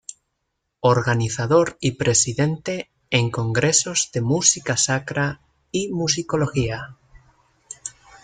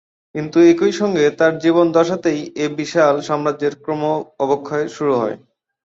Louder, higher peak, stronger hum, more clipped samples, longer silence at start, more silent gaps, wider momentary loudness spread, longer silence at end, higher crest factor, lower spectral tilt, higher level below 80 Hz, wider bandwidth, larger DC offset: second, -20 LUFS vs -17 LUFS; about the same, -2 dBFS vs -2 dBFS; neither; neither; second, 0.1 s vs 0.35 s; neither; first, 17 LU vs 10 LU; second, 0.35 s vs 0.6 s; about the same, 20 dB vs 16 dB; second, -3.5 dB/octave vs -6 dB/octave; first, -50 dBFS vs -60 dBFS; first, 9.6 kHz vs 7.8 kHz; neither